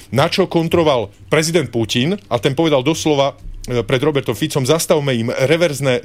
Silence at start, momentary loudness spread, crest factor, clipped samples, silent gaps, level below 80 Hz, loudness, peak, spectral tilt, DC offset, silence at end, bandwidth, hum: 0 s; 5 LU; 14 dB; under 0.1%; none; -42 dBFS; -16 LUFS; -2 dBFS; -5 dB/octave; 0.3%; 0 s; 16 kHz; none